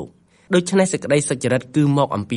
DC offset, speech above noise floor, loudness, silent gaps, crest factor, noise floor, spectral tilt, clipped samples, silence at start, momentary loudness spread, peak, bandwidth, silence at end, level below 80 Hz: under 0.1%; 21 dB; -19 LUFS; none; 16 dB; -40 dBFS; -5.5 dB/octave; under 0.1%; 0 s; 3 LU; -4 dBFS; 11.5 kHz; 0 s; -58 dBFS